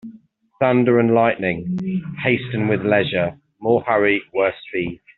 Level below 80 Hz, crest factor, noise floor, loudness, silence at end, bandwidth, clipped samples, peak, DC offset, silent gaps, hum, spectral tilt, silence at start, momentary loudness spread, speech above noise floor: -56 dBFS; 16 dB; -48 dBFS; -19 LUFS; 0.2 s; 4.3 kHz; under 0.1%; -4 dBFS; under 0.1%; none; none; -5 dB/octave; 0.05 s; 10 LU; 30 dB